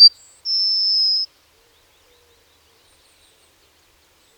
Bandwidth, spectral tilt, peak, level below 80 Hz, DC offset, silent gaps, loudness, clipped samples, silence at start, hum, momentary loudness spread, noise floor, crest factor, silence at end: 19.5 kHz; 2 dB/octave; 0 dBFS; -68 dBFS; under 0.1%; none; -16 LUFS; under 0.1%; 0 s; none; 14 LU; -57 dBFS; 20 dB; 3.1 s